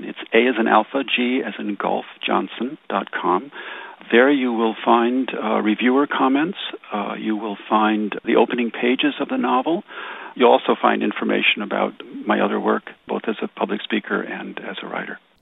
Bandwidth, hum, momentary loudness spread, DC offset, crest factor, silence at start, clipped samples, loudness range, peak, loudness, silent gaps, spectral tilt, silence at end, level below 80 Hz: 4 kHz; none; 13 LU; under 0.1%; 20 dB; 0 s; under 0.1%; 4 LU; -2 dBFS; -20 LUFS; none; -7.5 dB/octave; 0.25 s; -78 dBFS